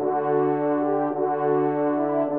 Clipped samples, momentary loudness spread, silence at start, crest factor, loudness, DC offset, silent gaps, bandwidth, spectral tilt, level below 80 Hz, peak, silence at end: under 0.1%; 2 LU; 0 s; 10 dB; -23 LUFS; 0.1%; none; 3.6 kHz; -8 dB/octave; -78 dBFS; -12 dBFS; 0 s